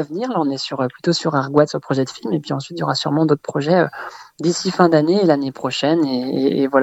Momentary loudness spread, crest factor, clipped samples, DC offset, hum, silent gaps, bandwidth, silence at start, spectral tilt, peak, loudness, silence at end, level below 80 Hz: 8 LU; 18 dB; under 0.1%; under 0.1%; none; none; 8.4 kHz; 0 s; -5.5 dB/octave; 0 dBFS; -18 LUFS; 0 s; -62 dBFS